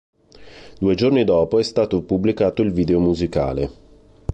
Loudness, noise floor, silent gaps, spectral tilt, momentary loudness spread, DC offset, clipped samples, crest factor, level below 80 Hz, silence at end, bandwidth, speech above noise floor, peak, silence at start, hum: -19 LUFS; -43 dBFS; none; -7.5 dB/octave; 7 LU; under 0.1%; under 0.1%; 14 dB; -38 dBFS; 0 s; 9 kHz; 25 dB; -6 dBFS; 0.4 s; none